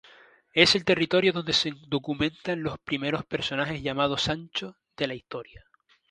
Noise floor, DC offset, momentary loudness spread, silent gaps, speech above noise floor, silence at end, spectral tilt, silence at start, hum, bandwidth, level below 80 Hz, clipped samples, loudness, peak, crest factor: -55 dBFS; under 0.1%; 13 LU; none; 28 dB; 0.55 s; -4 dB/octave; 0.55 s; none; 11 kHz; -56 dBFS; under 0.1%; -26 LUFS; -2 dBFS; 26 dB